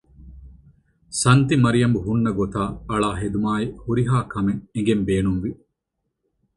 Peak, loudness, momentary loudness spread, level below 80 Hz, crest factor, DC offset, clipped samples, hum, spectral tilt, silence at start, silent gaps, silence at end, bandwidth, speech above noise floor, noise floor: -2 dBFS; -21 LUFS; 8 LU; -42 dBFS; 20 dB; under 0.1%; under 0.1%; none; -6 dB/octave; 0.2 s; none; 1 s; 11.5 kHz; 58 dB; -78 dBFS